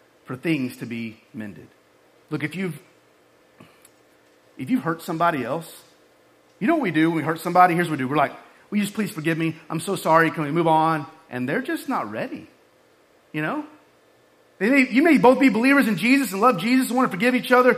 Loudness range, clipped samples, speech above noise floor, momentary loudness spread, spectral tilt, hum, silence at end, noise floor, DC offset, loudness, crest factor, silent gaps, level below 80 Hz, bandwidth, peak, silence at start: 13 LU; under 0.1%; 37 dB; 16 LU; -5.5 dB/octave; none; 0 s; -57 dBFS; under 0.1%; -21 LUFS; 20 dB; none; -68 dBFS; 15.5 kHz; -2 dBFS; 0.3 s